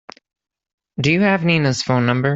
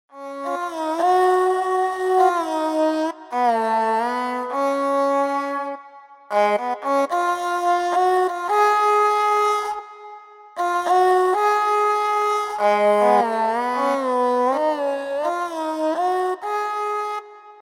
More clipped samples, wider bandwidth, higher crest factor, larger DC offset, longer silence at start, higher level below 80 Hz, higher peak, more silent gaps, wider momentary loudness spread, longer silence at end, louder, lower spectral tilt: neither; second, 8 kHz vs 16.5 kHz; about the same, 16 dB vs 16 dB; neither; first, 1 s vs 0.15 s; first, -54 dBFS vs -68 dBFS; about the same, -4 dBFS vs -4 dBFS; neither; second, 5 LU vs 9 LU; about the same, 0 s vs 0.05 s; first, -17 LUFS vs -20 LUFS; first, -6 dB/octave vs -3.5 dB/octave